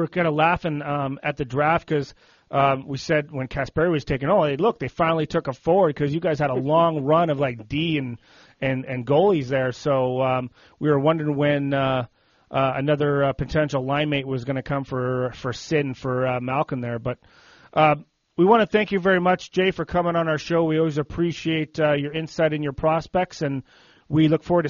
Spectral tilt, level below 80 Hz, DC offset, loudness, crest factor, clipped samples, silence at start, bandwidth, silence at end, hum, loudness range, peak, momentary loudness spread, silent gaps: -5.5 dB/octave; -50 dBFS; under 0.1%; -22 LUFS; 18 dB; under 0.1%; 0 s; 7.2 kHz; 0 s; none; 4 LU; -4 dBFS; 8 LU; none